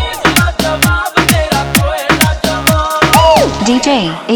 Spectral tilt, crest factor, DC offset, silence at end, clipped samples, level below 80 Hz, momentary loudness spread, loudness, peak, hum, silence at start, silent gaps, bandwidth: -4 dB/octave; 10 dB; under 0.1%; 0 s; 0.4%; -22 dBFS; 5 LU; -10 LUFS; 0 dBFS; none; 0 s; none; over 20 kHz